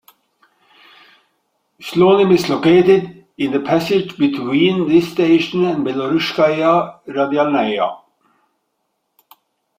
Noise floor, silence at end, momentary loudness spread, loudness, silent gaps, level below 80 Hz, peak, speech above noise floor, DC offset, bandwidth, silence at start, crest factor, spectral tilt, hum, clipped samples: -71 dBFS; 1.8 s; 9 LU; -15 LUFS; none; -58 dBFS; -2 dBFS; 56 dB; under 0.1%; 16 kHz; 1.8 s; 16 dB; -6.5 dB/octave; none; under 0.1%